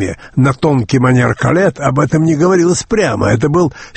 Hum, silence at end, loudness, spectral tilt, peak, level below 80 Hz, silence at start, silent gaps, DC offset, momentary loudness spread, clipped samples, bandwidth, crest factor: none; 0.05 s; -12 LUFS; -6.5 dB/octave; 0 dBFS; -38 dBFS; 0 s; none; under 0.1%; 4 LU; under 0.1%; 8.8 kHz; 12 dB